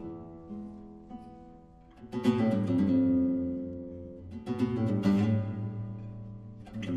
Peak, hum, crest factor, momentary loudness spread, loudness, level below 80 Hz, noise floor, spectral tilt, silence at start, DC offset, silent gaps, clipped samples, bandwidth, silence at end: -14 dBFS; none; 16 dB; 21 LU; -30 LUFS; -58 dBFS; -54 dBFS; -9 dB/octave; 0 s; under 0.1%; none; under 0.1%; 8.6 kHz; 0 s